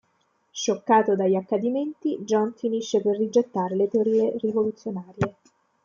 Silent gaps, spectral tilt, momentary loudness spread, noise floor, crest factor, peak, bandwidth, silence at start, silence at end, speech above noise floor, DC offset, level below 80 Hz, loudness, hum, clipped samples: none; -5.5 dB/octave; 9 LU; -69 dBFS; 16 dB; -8 dBFS; 7.4 kHz; 0.55 s; 0.55 s; 45 dB; under 0.1%; -68 dBFS; -24 LUFS; none; under 0.1%